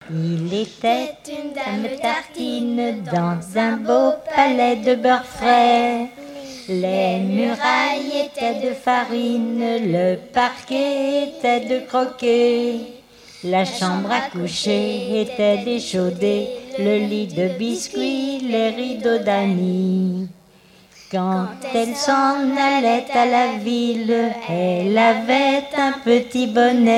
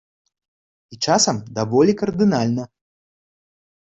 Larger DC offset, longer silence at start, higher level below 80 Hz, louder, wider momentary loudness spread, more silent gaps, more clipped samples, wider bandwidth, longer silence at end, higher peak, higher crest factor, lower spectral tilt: neither; second, 0 s vs 0.9 s; about the same, -60 dBFS vs -56 dBFS; about the same, -19 LUFS vs -19 LUFS; about the same, 8 LU vs 9 LU; neither; neither; first, 14.5 kHz vs 8.4 kHz; second, 0 s vs 1.3 s; about the same, -2 dBFS vs -4 dBFS; about the same, 18 dB vs 18 dB; about the same, -5.5 dB/octave vs -4.5 dB/octave